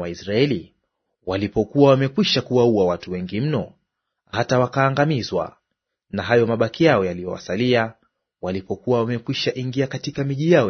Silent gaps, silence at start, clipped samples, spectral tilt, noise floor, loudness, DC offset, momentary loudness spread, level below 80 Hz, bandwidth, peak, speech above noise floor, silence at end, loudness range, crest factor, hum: none; 0 s; under 0.1%; -6.5 dB/octave; -79 dBFS; -21 LUFS; under 0.1%; 12 LU; -54 dBFS; 6.6 kHz; -2 dBFS; 59 dB; 0 s; 3 LU; 18 dB; none